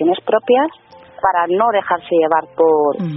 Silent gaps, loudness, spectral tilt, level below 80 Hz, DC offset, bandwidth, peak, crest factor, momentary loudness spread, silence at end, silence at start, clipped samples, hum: none; -16 LUFS; -4 dB/octave; -58 dBFS; under 0.1%; 5.4 kHz; 0 dBFS; 14 dB; 4 LU; 0 s; 0 s; under 0.1%; none